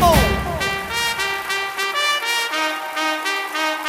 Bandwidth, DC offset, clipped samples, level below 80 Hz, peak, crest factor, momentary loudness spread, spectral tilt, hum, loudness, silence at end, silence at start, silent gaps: 16.5 kHz; under 0.1%; under 0.1%; -32 dBFS; -2 dBFS; 18 dB; 4 LU; -3 dB/octave; none; -20 LUFS; 0 s; 0 s; none